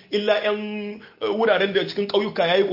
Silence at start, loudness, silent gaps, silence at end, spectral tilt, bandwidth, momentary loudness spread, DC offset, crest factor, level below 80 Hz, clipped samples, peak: 0.1 s; -22 LUFS; none; 0 s; -6 dB/octave; 5.8 kHz; 11 LU; under 0.1%; 16 dB; -68 dBFS; under 0.1%; -6 dBFS